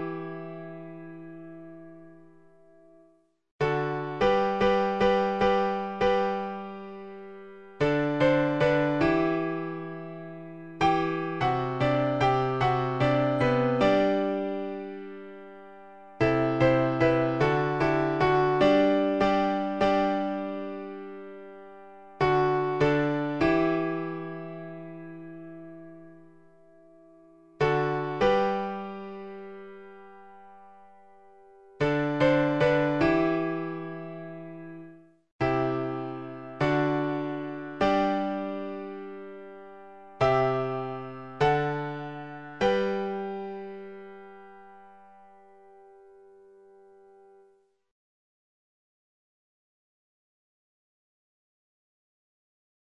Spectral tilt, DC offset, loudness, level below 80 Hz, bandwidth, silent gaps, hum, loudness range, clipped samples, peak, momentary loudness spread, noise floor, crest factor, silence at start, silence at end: -7.5 dB/octave; 0.2%; -26 LUFS; -54 dBFS; 8.6 kHz; 3.51-3.59 s, 35.32-35.39 s; none; 10 LU; under 0.1%; -10 dBFS; 20 LU; -64 dBFS; 18 dB; 0 s; 6.65 s